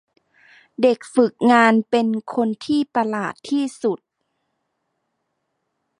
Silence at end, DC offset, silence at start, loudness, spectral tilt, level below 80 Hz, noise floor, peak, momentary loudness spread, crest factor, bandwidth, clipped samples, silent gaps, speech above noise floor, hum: 2.05 s; under 0.1%; 0.8 s; -19 LUFS; -5.5 dB/octave; -70 dBFS; -75 dBFS; -2 dBFS; 11 LU; 18 dB; 11 kHz; under 0.1%; none; 56 dB; none